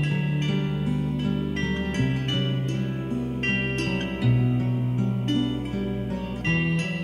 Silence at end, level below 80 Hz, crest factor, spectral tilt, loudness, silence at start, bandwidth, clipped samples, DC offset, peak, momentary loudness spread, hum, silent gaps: 0 s; -42 dBFS; 16 dB; -7 dB/octave; -25 LUFS; 0 s; 11 kHz; under 0.1%; under 0.1%; -10 dBFS; 5 LU; none; none